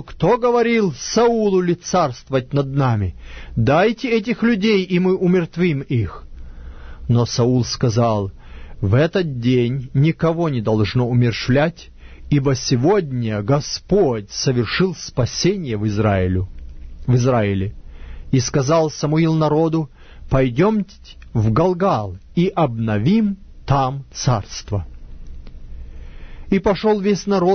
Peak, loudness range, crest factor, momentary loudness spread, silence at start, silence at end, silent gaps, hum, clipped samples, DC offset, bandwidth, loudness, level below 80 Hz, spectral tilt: -2 dBFS; 3 LU; 16 dB; 8 LU; 0 s; 0 s; none; none; under 0.1%; under 0.1%; 6.6 kHz; -18 LUFS; -38 dBFS; -6.5 dB/octave